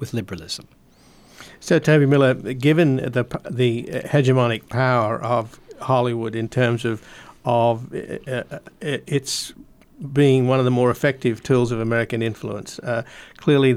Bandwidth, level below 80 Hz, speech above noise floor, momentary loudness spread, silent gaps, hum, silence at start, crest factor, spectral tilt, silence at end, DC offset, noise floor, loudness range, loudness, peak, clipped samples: 15 kHz; -54 dBFS; 31 dB; 14 LU; none; none; 0 s; 14 dB; -6.5 dB/octave; 0 s; under 0.1%; -51 dBFS; 5 LU; -21 LUFS; -6 dBFS; under 0.1%